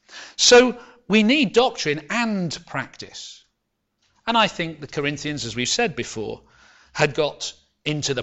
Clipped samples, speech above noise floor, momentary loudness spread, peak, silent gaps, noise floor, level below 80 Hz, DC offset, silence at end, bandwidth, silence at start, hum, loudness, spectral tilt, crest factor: under 0.1%; 55 dB; 19 LU; -2 dBFS; none; -76 dBFS; -54 dBFS; under 0.1%; 0 s; 8.2 kHz; 0.1 s; none; -20 LUFS; -3 dB/octave; 20 dB